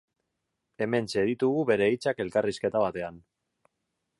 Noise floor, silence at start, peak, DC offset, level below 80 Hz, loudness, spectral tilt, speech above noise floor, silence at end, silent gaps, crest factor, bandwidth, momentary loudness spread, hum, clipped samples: -82 dBFS; 0.8 s; -12 dBFS; under 0.1%; -64 dBFS; -27 LUFS; -6 dB/octave; 55 dB; 1 s; none; 18 dB; 11.5 kHz; 8 LU; none; under 0.1%